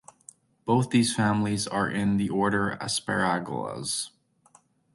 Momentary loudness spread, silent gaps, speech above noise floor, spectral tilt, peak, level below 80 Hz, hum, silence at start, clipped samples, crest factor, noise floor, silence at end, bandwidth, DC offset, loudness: 8 LU; none; 35 dB; -4.5 dB/octave; -10 dBFS; -58 dBFS; none; 0.65 s; under 0.1%; 18 dB; -61 dBFS; 0.85 s; 12 kHz; under 0.1%; -26 LUFS